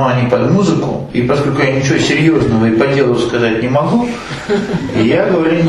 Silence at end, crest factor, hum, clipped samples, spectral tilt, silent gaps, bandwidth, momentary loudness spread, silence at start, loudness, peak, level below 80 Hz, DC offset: 0 s; 12 dB; none; under 0.1%; -6.5 dB/octave; none; 11.5 kHz; 6 LU; 0 s; -13 LUFS; 0 dBFS; -38 dBFS; under 0.1%